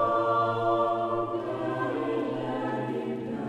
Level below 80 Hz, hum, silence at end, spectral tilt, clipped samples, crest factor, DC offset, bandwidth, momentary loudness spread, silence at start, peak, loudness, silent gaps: -62 dBFS; none; 0 s; -8 dB/octave; under 0.1%; 14 dB; under 0.1%; 10 kHz; 6 LU; 0 s; -14 dBFS; -29 LUFS; none